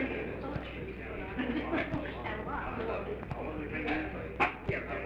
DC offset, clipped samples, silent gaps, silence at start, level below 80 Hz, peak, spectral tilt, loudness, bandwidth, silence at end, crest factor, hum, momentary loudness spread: under 0.1%; under 0.1%; none; 0 s; -48 dBFS; -14 dBFS; -7.5 dB/octave; -36 LUFS; 9.6 kHz; 0 s; 20 dB; none; 8 LU